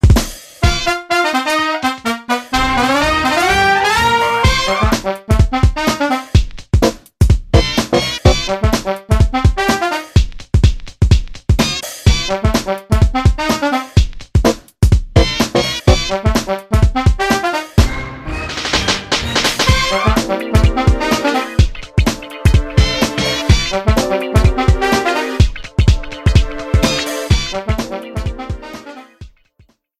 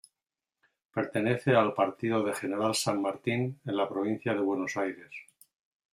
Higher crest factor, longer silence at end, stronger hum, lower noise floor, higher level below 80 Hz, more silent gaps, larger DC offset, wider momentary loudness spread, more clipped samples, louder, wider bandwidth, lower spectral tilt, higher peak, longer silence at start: second, 14 dB vs 20 dB; about the same, 0.7 s vs 0.7 s; neither; second, -53 dBFS vs under -90 dBFS; first, -18 dBFS vs -72 dBFS; neither; neither; second, 6 LU vs 10 LU; neither; first, -15 LUFS vs -30 LUFS; about the same, 15.5 kHz vs 14.5 kHz; about the same, -5 dB/octave vs -5 dB/octave; first, 0 dBFS vs -12 dBFS; second, 0.05 s vs 0.95 s